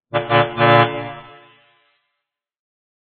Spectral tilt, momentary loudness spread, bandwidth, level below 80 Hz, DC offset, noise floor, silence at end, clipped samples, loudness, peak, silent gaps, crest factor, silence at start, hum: -8.5 dB/octave; 19 LU; 4.6 kHz; -58 dBFS; under 0.1%; -79 dBFS; 1.85 s; under 0.1%; -15 LUFS; 0 dBFS; none; 20 dB; 0.15 s; none